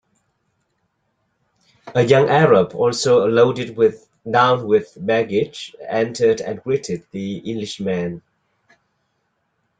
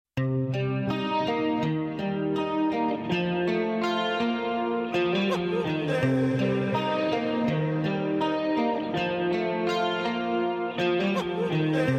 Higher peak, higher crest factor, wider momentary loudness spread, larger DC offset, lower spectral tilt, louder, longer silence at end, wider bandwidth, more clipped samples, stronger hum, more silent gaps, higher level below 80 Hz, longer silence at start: first, -2 dBFS vs -12 dBFS; about the same, 18 dB vs 14 dB; first, 13 LU vs 3 LU; neither; second, -5.5 dB/octave vs -7 dB/octave; first, -18 LUFS vs -27 LUFS; first, 1.6 s vs 0 s; second, 9.2 kHz vs 12.5 kHz; neither; neither; neither; about the same, -60 dBFS vs -60 dBFS; first, 1.85 s vs 0.15 s